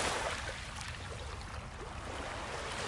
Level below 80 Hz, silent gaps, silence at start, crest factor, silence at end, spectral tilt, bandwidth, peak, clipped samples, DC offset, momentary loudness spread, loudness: -50 dBFS; none; 0 s; 20 dB; 0 s; -3 dB/octave; 11.5 kHz; -20 dBFS; under 0.1%; under 0.1%; 8 LU; -41 LUFS